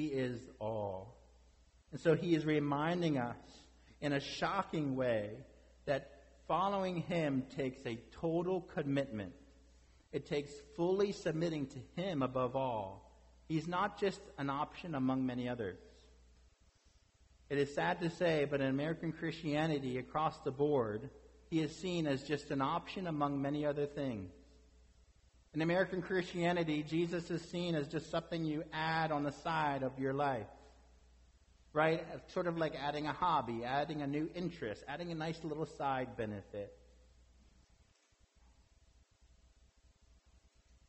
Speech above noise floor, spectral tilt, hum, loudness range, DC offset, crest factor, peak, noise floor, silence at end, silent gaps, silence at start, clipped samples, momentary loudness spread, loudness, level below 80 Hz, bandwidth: 35 dB; -6.5 dB/octave; none; 4 LU; under 0.1%; 18 dB; -20 dBFS; -72 dBFS; 4.15 s; none; 0 s; under 0.1%; 10 LU; -38 LUFS; -64 dBFS; 8.2 kHz